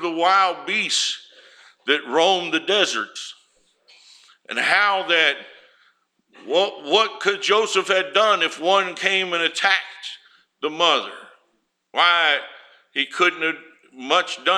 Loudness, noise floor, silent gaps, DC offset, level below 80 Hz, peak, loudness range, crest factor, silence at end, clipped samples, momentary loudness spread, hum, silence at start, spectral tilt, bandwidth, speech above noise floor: -19 LUFS; -69 dBFS; none; under 0.1%; -82 dBFS; -2 dBFS; 3 LU; 20 dB; 0 s; under 0.1%; 14 LU; none; 0 s; -1 dB/octave; 13.5 kHz; 49 dB